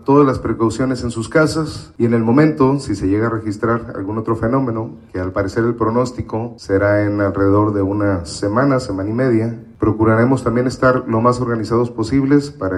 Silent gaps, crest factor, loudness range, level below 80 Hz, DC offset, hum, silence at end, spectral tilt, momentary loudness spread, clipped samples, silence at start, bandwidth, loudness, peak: none; 16 dB; 3 LU; -40 dBFS; under 0.1%; none; 0 s; -7.5 dB/octave; 8 LU; under 0.1%; 0 s; 11.5 kHz; -17 LUFS; 0 dBFS